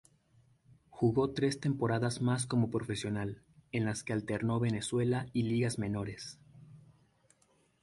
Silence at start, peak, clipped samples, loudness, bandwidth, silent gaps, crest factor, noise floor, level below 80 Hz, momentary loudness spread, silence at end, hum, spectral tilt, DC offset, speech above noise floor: 0.95 s; -18 dBFS; under 0.1%; -33 LUFS; 11.5 kHz; none; 18 dB; -71 dBFS; -62 dBFS; 9 LU; 1.05 s; none; -6 dB/octave; under 0.1%; 38 dB